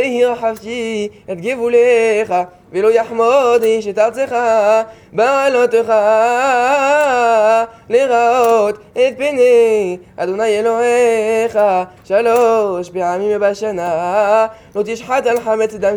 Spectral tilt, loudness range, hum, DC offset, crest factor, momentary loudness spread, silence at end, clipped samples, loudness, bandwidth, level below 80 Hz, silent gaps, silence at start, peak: -4 dB/octave; 3 LU; none; under 0.1%; 12 dB; 9 LU; 0 s; under 0.1%; -14 LUFS; over 20 kHz; -56 dBFS; none; 0 s; 0 dBFS